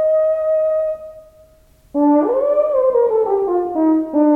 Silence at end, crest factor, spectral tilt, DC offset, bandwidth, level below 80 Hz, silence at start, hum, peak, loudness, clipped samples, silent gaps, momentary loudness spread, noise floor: 0 s; 12 dB; -8.5 dB/octave; under 0.1%; 2.7 kHz; -54 dBFS; 0 s; none; -4 dBFS; -16 LUFS; under 0.1%; none; 8 LU; -50 dBFS